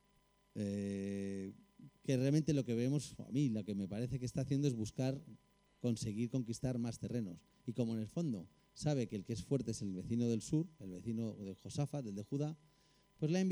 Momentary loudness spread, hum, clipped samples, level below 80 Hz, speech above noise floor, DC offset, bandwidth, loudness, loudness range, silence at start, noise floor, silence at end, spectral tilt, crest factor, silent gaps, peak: 11 LU; none; under 0.1%; -66 dBFS; 35 dB; under 0.1%; 13 kHz; -40 LUFS; 4 LU; 0.55 s; -74 dBFS; 0 s; -7 dB/octave; 16 dB; none; -22 dBFS